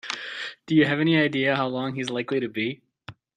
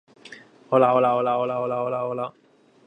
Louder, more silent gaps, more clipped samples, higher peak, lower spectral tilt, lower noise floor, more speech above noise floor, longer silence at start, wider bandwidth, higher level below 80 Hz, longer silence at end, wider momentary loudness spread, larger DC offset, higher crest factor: about the same, -24 LUFS vs -22 LUFS; neither; neither; second, -8 dBFS vs -4 dBFS; second, -6 dB/octave vs -7.5 dB/octave; about the same, -47 dBFS vs -47 dBFS; about the same, 24 dB vs 25 dB; second, 0.05 s vs 0.25 s; about the same, 9.8 kHz vs 9.2 kHz; first, -66 dBFS vs -74 dBFS; second, 0.25 s vs 0.55 s; about the same, 12 LU vs 11 LU; neither; about the same, 16 dB vs 20 dB